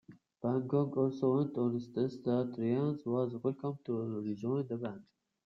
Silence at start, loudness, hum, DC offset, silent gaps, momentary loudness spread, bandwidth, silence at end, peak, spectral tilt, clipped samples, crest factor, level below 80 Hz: 0.1 s; -35 LUFS; none; under 0.1%; none; 8 LU; 7 kHz; 0.45 s; -18 dBFS; -10 dB/octave; under 0.1%; 16 dB; -76 dBFS